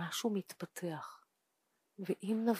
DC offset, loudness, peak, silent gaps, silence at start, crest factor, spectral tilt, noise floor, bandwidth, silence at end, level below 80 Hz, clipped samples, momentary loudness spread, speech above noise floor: under 0.1%; -40 LUFS; -20 dBFS; none; 0 s; 20 dB; -5 dB/octave; -82 dBFS; 15.5 kHz; 0 s; under -90 dBFS; under 0.1%; 11 LU; 45 dB